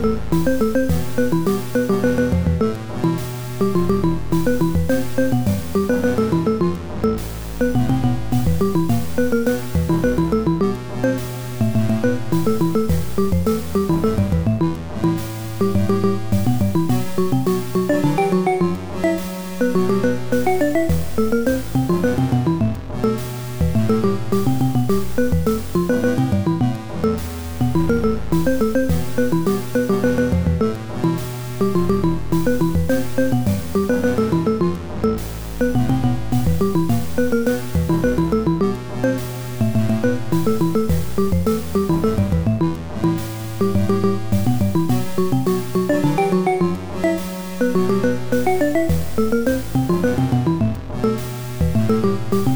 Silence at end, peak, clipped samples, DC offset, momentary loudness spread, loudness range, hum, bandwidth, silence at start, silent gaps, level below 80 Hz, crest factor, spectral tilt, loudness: 0 s; -6 dBFS; under 0.1%; 5%; 4 LU; 1 LU; none; over 20 kHz; 0 s; none; -34 dBFS; 14 dB; -7 dB/octave; -20 LUFS